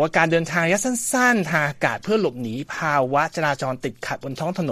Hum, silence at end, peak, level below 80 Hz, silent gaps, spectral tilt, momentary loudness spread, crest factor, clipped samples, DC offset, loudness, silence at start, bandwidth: none; 0 s; -2 dBFS; -58 dBFS; none; -4.5 dB/octave; 11 LU; 20 dB; under 0.1%; under 0.1%; -21 LUFS; 0 s; 14.5 kHz